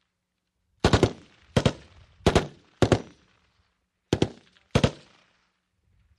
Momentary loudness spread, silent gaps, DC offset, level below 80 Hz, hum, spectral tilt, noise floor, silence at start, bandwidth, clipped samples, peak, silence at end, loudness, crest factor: 8 LU; none; under 0.1%; -40 dBFS; none; -6 dB/octave; -80 dBFS; 0.85 s; 12.5 kHz; under 0.1%; -4 dBFS; 1.25 s; -26 LUFS; 24 dB